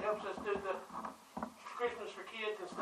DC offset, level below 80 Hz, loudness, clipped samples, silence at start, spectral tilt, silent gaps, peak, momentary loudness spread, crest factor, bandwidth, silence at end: under 0.1%; -72 dBFS; -42 LUFS; under 0.1%; 0 s; -4 dB/octave; none; -24 dBFS; 8 LU; 18 dB; 15 kHz; 0 s